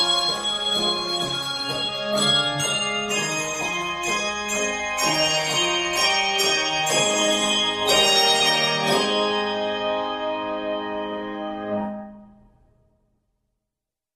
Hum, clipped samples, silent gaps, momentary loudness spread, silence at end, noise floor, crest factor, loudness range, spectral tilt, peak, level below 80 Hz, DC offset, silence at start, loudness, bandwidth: none; under 0.1%; none; 10 LU; 1.85 s; -86 dBFS; 18 dB; 11 LU; -1.5 dB/octave; -6 dBFS; -56 dBFS; under 0.1%; 0 s; -21 LUFS; 15.5 kHz